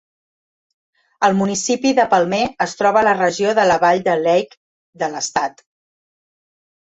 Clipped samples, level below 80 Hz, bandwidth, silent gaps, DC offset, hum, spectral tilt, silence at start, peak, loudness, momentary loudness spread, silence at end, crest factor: under 0.1%; -58 dBFS; 8.4 kHz; 4.57-4.93 s; under 0.1%; none; -4 dB/octave; 1.2 s; -2 dBFS; -17 LUFS; 8 LU; 1.35 s; 16 dB